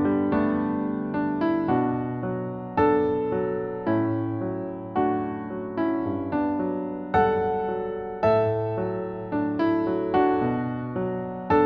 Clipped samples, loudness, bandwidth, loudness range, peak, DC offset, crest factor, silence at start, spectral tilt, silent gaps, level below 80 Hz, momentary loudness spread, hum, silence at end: under 0.1%; -26 LUFS; 5.2 kHz; 2 LU; -8 dBFS; under 0.1%; 16 dB; 0 s; -10 dB/octave; none; -52 dBFS; 8 LU; none; 0 s